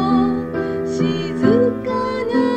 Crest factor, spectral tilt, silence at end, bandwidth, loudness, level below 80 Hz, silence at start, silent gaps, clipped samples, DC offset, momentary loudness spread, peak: 16 dB; -7.5 dB/octave; 0 s; 8.8 kHz; -19 LUFS; -50 dBFS; 0 s; none; under 0.1%; 0.4%; 7 LU; -2 dBFS